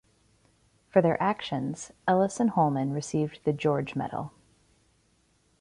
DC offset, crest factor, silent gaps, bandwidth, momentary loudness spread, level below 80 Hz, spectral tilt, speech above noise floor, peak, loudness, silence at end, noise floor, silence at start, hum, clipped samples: under 0.1%; 22 dB; none; 11.5 kHz; 9 LU; -64 dBFS; -6.5 dB/octave; 41 dB; -8 dBFS; -28 LUFS; 1.3 s; -67 dBFS; 0.95 s; none; under 0.1%